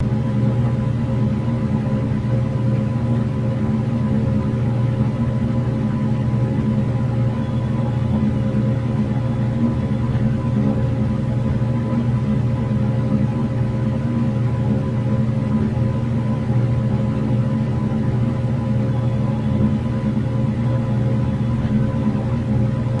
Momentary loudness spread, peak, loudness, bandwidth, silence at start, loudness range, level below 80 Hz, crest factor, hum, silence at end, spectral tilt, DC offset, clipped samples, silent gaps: 2 LU; -6 dBFS; -20 LUFS; 6.4 kHz; 0 s; 0 LU; -36 dBFS; 14 dB; none; 0 s; -9.5 dB/octave; under 0.1%; under 0.1%; none